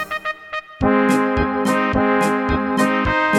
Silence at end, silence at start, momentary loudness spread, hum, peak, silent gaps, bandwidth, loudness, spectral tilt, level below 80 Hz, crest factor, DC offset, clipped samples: 0 s; 0 s; 9 LU; none; -4 dBFS; none; 15 kHz; -18 LUFS; -5.5 dB/octave; -34 dBFS; 14 dB; under 0.1%; under 0.1%